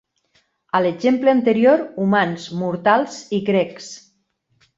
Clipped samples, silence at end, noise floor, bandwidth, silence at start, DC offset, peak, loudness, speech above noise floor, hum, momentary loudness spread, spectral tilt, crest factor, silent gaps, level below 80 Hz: under 0.1%; 0.8 s; -67 dBFS; 7.8 kHz; 0.75 s; under 0.1%; -2 dBFS; -18 LUFS; 49 dB; none; 11 LU; -6 dB/octave; 18 dB; none; -64 dBFS